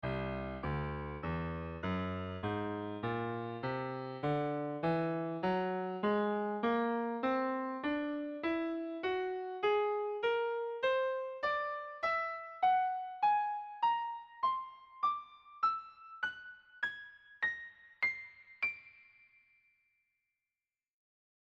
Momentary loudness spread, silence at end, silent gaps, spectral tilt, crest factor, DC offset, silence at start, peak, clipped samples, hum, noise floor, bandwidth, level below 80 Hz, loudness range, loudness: 8 LU; 2.55 s; none; -8 dB/octave; 16 dB; under 0.1%; 0.05 s; -22 dBFS; under 0.1%; none; under -90 dBFS; 7.4 kHz; -60 dBFS; 5 LU; -36 LUFS